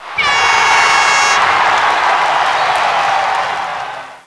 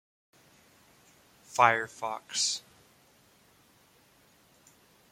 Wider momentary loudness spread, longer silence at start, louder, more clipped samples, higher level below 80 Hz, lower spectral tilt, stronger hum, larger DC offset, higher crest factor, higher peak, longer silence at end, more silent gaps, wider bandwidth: second, 9 LU vs 13 LU; second, 0 s vs 1.5 s; first, -11 LUFS vs -28 LUFS; neither; first, -52 dBFS vs -78 dBFS; about the same, 0 dB/octave vs -1 dB/octave; neither; first, 0.2% vs under 0.1%; second, 12 dB vs 30 dB; first, 0 dBFS vs -6 dBFS; second, 0.1 s vs 2.55 s; neither; second, 11 kHz vs 16.5 kHz